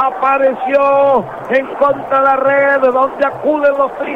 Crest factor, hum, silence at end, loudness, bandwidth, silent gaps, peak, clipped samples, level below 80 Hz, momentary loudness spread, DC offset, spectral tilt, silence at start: 10 dB; none; 0 s; -13 LUFS; 5.2 kHz; none; -2 dBFS; under 0.1%; -52 dBFS; 6 LU; under 0.1%; -6.5 dB/octave; 0 s